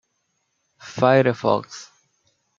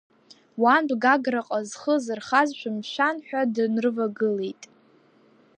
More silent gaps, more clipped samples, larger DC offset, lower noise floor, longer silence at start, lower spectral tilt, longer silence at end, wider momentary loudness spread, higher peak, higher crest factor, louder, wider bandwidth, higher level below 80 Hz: neither; neither; neither; first, -72 dBFS vs -58 dBFS; first, 0.85 s vs 0.55 s; first, -6 dB/octave vs -4.5 dB/octave; second, 0.75 s vs 0.9 s; first, 21 LU vs 10 LU; first, -2 dBFS vs -6 dBFS; about the same, 22 dB vs 20 dB; first, -19 LUFS vs -24 LUFS; second, 7.6 kHz vs 10 kHz; first, -68 dBFS vs -80 dBFS